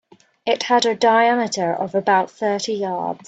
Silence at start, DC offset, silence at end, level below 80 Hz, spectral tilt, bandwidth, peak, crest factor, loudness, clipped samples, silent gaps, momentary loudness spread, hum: 0.45 s; under 0.1%; 0.1 s; -68 dBFS; -3.5 dB/octave; 9 kHz; -2 dBFS; 16 dB; -19 LUFS; under 0.1%; none; 8 LU; none